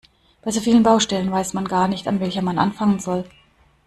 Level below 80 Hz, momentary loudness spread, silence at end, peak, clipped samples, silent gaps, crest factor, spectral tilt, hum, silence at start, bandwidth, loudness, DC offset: -52 dBFS; 11 LU; 0.6 s; -2 dBFS; under 0.1%; none; 18 dB; -5 dB/octave; none; 0.45 s; 13 kHz; -20 LUFS; under 0.1%